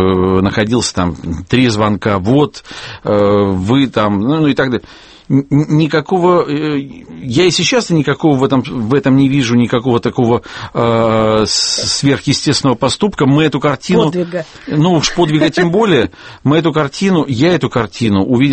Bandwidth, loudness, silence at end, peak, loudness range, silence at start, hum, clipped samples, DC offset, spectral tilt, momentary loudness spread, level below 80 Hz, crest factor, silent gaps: 8.8 kHz; -13 LUFS; 0 s; 0 dBFS; 1 LU; 0 s; none; under 0.1%; under 0.1%; -5.5 dB/octave; 7 LU; -40 dBFS; 12 dB; none